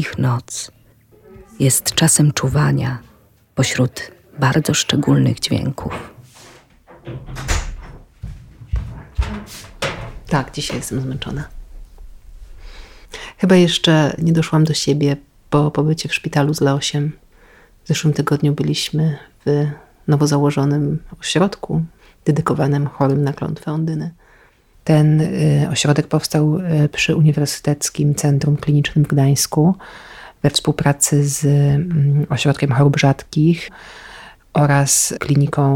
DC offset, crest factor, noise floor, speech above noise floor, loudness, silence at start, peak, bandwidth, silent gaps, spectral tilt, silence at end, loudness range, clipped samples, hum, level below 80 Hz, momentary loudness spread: under 0.1%; 16 dB; -51 dBFS; 35 dB; -17 LUFS; 0 s; -2 dBFS; 16.5 kHz; none; -5 dB/octave; 0 s; 10 LU; under 0.1%; none; -36 dBFS; 15 LU